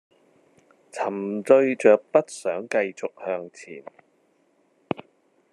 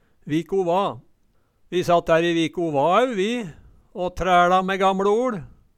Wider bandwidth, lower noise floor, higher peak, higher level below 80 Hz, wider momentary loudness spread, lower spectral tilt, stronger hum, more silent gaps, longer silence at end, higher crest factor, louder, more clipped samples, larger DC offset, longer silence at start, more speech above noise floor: second, 11 kHz vs 14 kHz; about the same, -65 dBFS vs -62 dBFS; first, -2 dBFS vs -6 dBFS; second, -82 dBFS vs -48 dBFS; first, 22 LU vs 12 LU; about the same, -5.5 dB/octave vs -5.5 dB/octave; neither; neither; first, 1.7 s vs 0.3 s; first, 22 dB vs 16 dB; about the same, -23 LUFS vs -21 LUFS; neither; neither; first, 0.95 s vs 0.25 s; about the same, 42 dB vs 42 dB